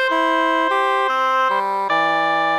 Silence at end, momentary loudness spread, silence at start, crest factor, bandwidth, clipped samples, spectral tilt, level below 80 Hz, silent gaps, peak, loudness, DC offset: 0 s; 2 LU; 0 s; 12 dB; 15.5 kHz; under 0.1%; -3.5 dB/octave; -76 dBFS; none; -6 dBFS; -18 LUFS; under 0.1%